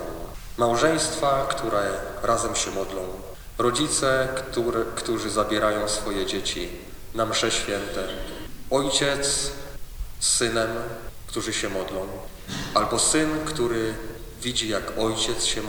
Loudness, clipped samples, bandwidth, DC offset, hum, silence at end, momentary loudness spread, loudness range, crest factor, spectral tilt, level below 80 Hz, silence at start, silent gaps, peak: -24 LUFS; under 0.1%; over 20 kHz; under 0.1%; none; 0 s; 15 LU; 2 LU; 20 dB; -2.5 dB/octave; -40 dBFS; 0 s; none; -4 dBFS